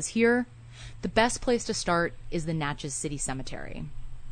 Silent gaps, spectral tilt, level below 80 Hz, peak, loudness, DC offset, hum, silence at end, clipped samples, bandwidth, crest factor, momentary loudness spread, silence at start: none; -4 dB/octave; -42 dBFS; -8 dBFS; -28 LUFS; under 0.1%; none; 0 s; under 0.1%; 9.6 kHz; 20 dB; 17 LU; 0 s